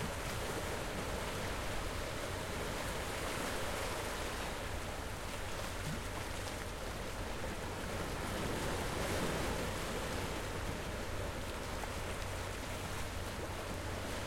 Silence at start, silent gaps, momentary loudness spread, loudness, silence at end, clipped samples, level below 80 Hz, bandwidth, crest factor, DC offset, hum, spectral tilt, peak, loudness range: 0 s; none; 4 LU; -40 LUFS; 0 s; under 0.1%; -48 dBFS; 16.5 kHz; 16 dB; under 0.1%; none; -4 dB/octave; -24 dBFS; 3 LU